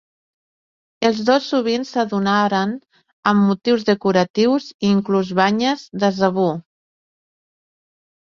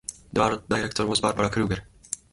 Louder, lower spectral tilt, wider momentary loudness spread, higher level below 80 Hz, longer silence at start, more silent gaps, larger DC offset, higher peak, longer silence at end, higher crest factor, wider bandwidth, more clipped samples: first, -18 LUFS vs -26 LUFS; first, -6 dB/octave vs -4 dB/octave; second, 5 LU vs 10 LU; second, -62 dBFS vs -48 dBFS; first, 1 s vs 0.1 s; first, 3.13-3.23 s, 4.30-4.34 s, 4.74-4.79 s vs none; neither; first, -2 dBFS vs -6 dBFS; first, 1.7 s vs 0.15 s; about the same, 18 dB vs 20 dB; second, 7.2 kHz vs 11.5 kHz; neither